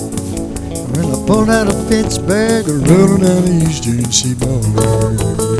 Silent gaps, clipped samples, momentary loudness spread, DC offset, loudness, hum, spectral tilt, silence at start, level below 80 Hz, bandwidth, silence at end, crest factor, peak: none; under 0.1%; 11 LU; under 0.1%; -13 LUFS; none; -5.5 dB/octave; 0 s; -30 dBFS; 11 kHz; 0 s; 12 dB; 0 dBFS